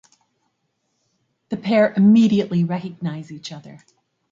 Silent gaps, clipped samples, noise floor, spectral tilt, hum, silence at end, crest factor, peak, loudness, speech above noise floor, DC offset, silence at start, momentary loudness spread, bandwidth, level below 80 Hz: none; under 0.1%; -72 dBFS; -7.5 dB/octave; none; 0.6 s; 16 dB; -4 dBFS; -18 LUFS; 54 dB; under 0.1%; 1.5 s; 20 LU; 7.6 kHz; -66 dBFS